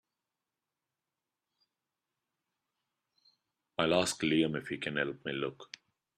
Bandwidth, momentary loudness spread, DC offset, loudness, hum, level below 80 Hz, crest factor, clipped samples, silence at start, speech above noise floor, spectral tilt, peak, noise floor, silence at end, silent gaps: 13 kHz; 19 LU; under 0.1%; -33 LUFS; none; -72 dBFS; 24 dB; under 0.1%; 3.8 s; 57 dB; -4 dB/octave; -14 dBFS; -90 dBFS; 0.55 s; none